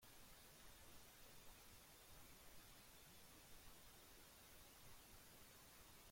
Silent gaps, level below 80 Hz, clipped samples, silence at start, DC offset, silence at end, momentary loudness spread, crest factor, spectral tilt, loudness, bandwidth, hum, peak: none; -74 dBFS; under 0.1%; 0 s; under 0.1%; 0 s; 0 LU; 14 dB; -2.5 dB/octave; -64 LUFS; 16.5 kHz; none; -50 dBFS